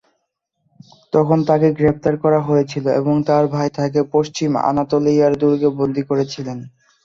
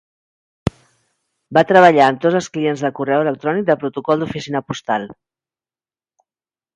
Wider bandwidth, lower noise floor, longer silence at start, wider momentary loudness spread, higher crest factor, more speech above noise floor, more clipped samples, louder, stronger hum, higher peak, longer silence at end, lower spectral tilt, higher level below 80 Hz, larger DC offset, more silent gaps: second, 7.6 kHz vs 11.5 kHz; second, -72 dBFS vs under -90 dBFS; first, 1.15 s vs 0.65 s; second, 6 LU vs 15 LU; about the same, 16 dB vs 18 dB; second, 56 dB vs over 74 dB; neither; about the same, -17 LUFS vs -17 LUFS; neither; about the same, -2 dBFS vs 0 dBFS; second, 0.35 s vs 1.65 s; first, -7.5 dB/octave vs -6 dB/octave; about the same, -52 dBFS vs -48 dBFS; neither; neither